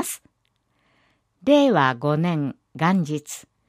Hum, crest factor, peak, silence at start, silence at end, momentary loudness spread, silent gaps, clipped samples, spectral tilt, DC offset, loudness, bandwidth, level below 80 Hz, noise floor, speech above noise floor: none; 18 dB; -4 dBFS; 0 s; 0.3 s; 14 LU; none; under 0.1%; -5.5 dB/octave; under 0.1%; -21 LUFS; 15.5 kHz; -68 dBFS; -70 dBFS; 50 dB